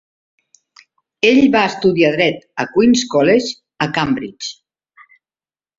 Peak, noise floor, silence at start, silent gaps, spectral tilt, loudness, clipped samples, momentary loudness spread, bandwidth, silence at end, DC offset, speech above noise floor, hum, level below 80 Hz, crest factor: 0 dBFS; under -90 dBFS; 1.25 s; none; -4.5 dB/octave; -15 LUFS; under 0.1%; 13 LU; 7.8 kHz; 1.25 s; under 0.1%; over 76 dB; none; -54 dBFS; 16 dB